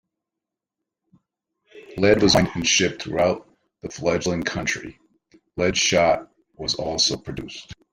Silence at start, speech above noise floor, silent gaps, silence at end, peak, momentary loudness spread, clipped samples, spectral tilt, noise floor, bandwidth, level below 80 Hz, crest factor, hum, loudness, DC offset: 1.75 s; 65 dB; none; 0.2 s; -2 dBFS; 19 LU; under 0.1%; -3.5 dB/octave; -86 dBFS; 15.5 kHz; -48 dBFS; 22 dB; none; -21 LUFS; under 0.1%